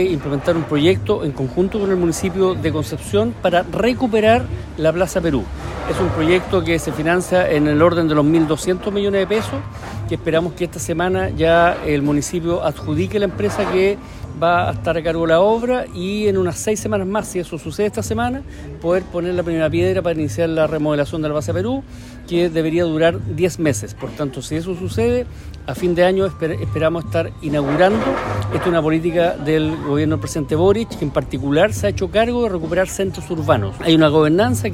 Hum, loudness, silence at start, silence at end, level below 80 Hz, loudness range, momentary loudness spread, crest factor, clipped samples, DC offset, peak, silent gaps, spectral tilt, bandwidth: none; -18 LUFS; 0 s; 0 s; -36 dBFS; 3 LU; 9 LU; 16 dB; under 0.1%; under 0.1%; -2 dBFS; none; -6 dB/octave; 16 kHz